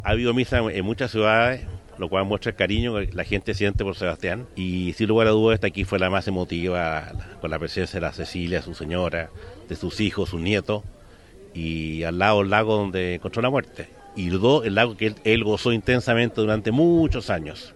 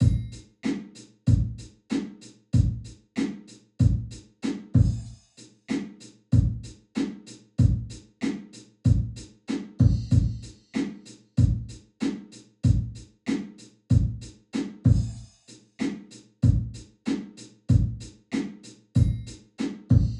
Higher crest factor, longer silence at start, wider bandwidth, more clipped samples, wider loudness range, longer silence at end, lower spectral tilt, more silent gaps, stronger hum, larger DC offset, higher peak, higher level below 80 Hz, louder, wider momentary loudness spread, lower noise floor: about the same, 22 dB vs 18 dB; about the same, 0 s vs 0 s; first, 12 kHz vs 9.8 kHz; neither; first, 6 LU vs 3 LU; about the same, 0.05 s vs 0 s; about the same, -6.5 dB/octave vs -7.5 dB/octave; neither; neither; neither; first, -2 dBFS vs -8 dBFS; about the same, -40 dBFS vs -36 dBFS; first, -23 LUFS vs -27 LUFS; second, 12 LU vs 18 LU; second, -47 dBFS vs -53 dBFS